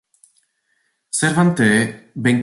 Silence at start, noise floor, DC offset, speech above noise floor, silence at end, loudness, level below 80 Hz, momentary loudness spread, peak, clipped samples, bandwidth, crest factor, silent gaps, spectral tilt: 1.15 s; -68 dBFS; under 0.1%; 51 dB; 0 s; -17 LUFS; -56 dBFS; 9 LU; -4 dBFS; under 0.1%; 11.5 kHz; 16 dB; none; -5 dB/octave